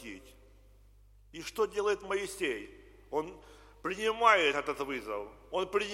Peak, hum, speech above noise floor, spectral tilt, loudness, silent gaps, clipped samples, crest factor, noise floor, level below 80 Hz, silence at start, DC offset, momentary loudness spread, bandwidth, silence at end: -10 dBFS; none; 27 dB; -3 dB/octave; -32 LUFS; none; under 0.1%; 24 dB; -59 dBFS; -60 dBFS; 0 s; under 0.1%; 19 LU; 16.5 kHz; 0 s